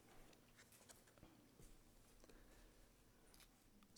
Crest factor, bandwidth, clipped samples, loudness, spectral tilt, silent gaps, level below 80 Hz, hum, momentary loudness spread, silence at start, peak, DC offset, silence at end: 22 dB; over 20 kHz; under 0.1%; -68 LUFS; -3.5 dB/octave; none; -72 dBFS; none; 4 LU; 0 s; -46 dBFS; under 0.1%; 0 s